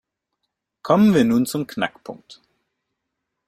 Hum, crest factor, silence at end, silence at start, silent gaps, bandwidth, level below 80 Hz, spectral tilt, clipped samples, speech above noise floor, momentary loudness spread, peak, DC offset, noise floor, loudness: none; 20 dB; 1.35 s; 0.85 s; none; 15.5 kHz; -58 dBFS; -6 dB/octave; under 0.1%; 60 dB; 23 LU; -2 dBFS; under 0.1%; -79 dBFS; -19 LUFS